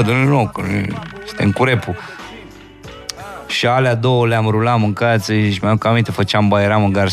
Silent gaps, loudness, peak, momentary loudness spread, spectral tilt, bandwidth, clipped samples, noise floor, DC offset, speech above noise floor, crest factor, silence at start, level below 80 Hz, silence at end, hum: none; -16 LUFS; 0 dBFS; 16 LU; -6.5 dB/octave; 14 kHz; under 0.1%; -37 dBFS; under 0.1%; 22 dB; 16 dB; 0 s; -48 dBFS; 0 s; none